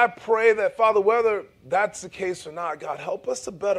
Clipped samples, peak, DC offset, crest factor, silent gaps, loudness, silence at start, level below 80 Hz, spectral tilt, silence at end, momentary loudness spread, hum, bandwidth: under 0.1%; -6 dBFS; under 0.1%; 16 dB; none; -24 LUFS; 0 s; -64 dBFS; -3.5 dB/octave; 0 s; 11 LU; none; 11.5 kHz